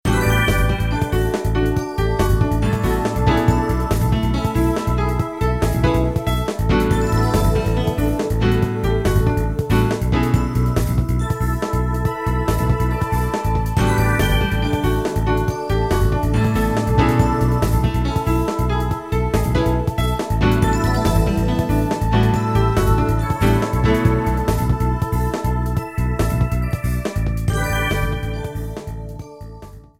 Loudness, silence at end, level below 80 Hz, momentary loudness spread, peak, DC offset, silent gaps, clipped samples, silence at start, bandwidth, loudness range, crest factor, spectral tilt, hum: -19 LUFS; 0.2 s; -24 dBFS; 5 LU; -2 dBFS; 0.2%; none; under 0.1%; 0.05 s; 16.5 kHz; 3 LU; 16 dB; -6.5 dB/octave; none